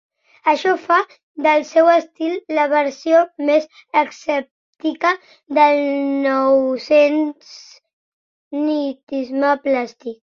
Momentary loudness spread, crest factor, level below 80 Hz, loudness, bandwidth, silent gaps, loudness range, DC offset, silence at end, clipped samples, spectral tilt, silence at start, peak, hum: 10 LU; 16 dB; -68 dBFS; -18 LUFS; 7.2 kHz; 1.23-1.35 s, 4.51-4.73 s, 7.93-8.51 s, 9.03-9.07 s; 3 LU; under 0.1%; 0.15 s; under 0.1%; -3.5 dB/octave; 0.45 s; -2 dBFS; none